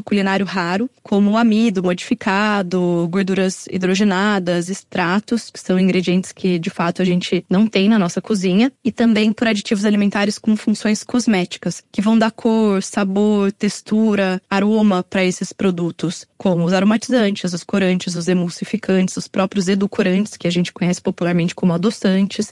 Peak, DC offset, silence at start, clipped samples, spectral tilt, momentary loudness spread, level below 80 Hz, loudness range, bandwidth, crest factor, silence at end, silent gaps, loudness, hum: -2 dBFS; under 0.1%; 0.05 s; under 0.1%; -5.5 dB/octave; 5 LU; -60 dBFS; 2 LU; 11.5 kHz; 16 dB; 0 s; none; -18 LUFS; none